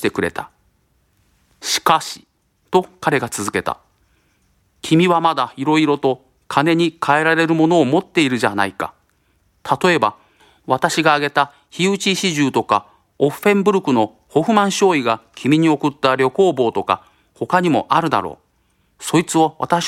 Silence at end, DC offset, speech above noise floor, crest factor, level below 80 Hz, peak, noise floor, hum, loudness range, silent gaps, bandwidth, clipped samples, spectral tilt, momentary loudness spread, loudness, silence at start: 0 s; under 0.1%; 45 dB; 18 dB; -60 dBFS; 0 dBFS; -62 dBFS; none; 5 LU; none; 16 kHz; under 0.1%; -4.5 dB/octave; 9 LU; -17 LUFS; 0 s